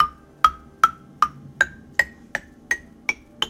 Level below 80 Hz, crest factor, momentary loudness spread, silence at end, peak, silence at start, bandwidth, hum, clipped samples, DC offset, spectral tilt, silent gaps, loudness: -50 dBFS; 24 dB; 7 LU; 0 s; 0 dBFS; 0 s; 16.5 kHz; none; under 0.1%; under 0.1%; -1.5 dB/octave; none; -23 LUFS